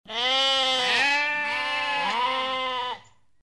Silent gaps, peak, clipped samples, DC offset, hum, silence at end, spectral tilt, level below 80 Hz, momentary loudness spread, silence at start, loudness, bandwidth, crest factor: none; -12 dBFS; under 0.1%; 0.1%; none; 0.4 s; -0.5 dB/octave; -68 dBFS; 8 LU; 0.1 s; -23 LUFS; 13 kHz; 14 dB